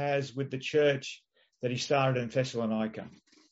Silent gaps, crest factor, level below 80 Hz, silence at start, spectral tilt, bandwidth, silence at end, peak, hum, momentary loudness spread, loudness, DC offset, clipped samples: none; 16 dB; -72 dBFS; 0 s; -4.5 dB/octave; 8 kHz; 0.4 s; -14 dBFS; none; 16 LU; -30 LUFS; under 0.1%; under 0.1%